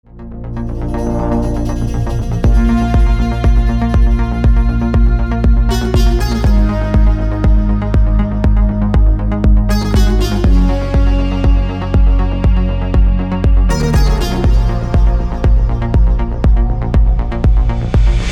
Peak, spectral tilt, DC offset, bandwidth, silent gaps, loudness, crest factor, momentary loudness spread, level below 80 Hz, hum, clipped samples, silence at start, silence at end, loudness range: -2 dBFS; -7.5 dB/octave; under 0.1%; 8.8 kHz; none; -14 LUFS; 8 dB; 3 LU; -12 dBFS; none; under 0.1%; 0.15 s; 0 s; 1 LU